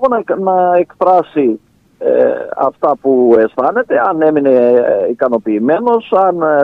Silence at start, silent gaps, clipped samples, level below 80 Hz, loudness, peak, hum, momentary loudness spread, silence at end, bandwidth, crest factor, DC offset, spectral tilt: 0 s; none; under 0.1%; -56 dBFS; -12 LUFS; 0 dBFS; none; 5 LU; 0 s; 4.6 kHz; 12 dB; under 0.1%; -9 dB/octave